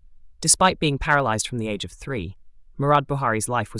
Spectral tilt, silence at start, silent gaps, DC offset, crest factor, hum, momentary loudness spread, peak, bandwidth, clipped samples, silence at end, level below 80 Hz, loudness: -3.5 dB/octave; 0.1 s; none; under 0.1%; 20 dB; none; 14 LU; -2 dBFS; 12 kHz; under 0.1%; 0 s; -44 dBFS; -22 LUFS